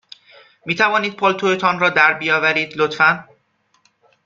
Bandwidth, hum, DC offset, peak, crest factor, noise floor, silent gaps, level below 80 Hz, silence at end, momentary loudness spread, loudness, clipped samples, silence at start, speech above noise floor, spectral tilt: 7.6 kHz; none; under 0.1%; -2 dBFS; 18 dB; -63 dBFS; none; -64 dBFS; 1.05 s; 8 LU; -16 LUFS; under 0.1%; 0.65 s; 46 dB; -4.5 dB/octave